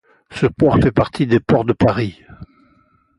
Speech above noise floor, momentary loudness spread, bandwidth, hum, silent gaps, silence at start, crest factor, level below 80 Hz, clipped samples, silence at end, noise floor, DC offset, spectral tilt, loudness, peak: 41 dB; 9 LU; 11 kHz; none; none; 0.3 s; 16 dB; -38 dBFS; under 0.1%; 0.75 s; -57 dBFS; under 0.1%; -8 dB/octave; -16 LUFS; -2 dBFS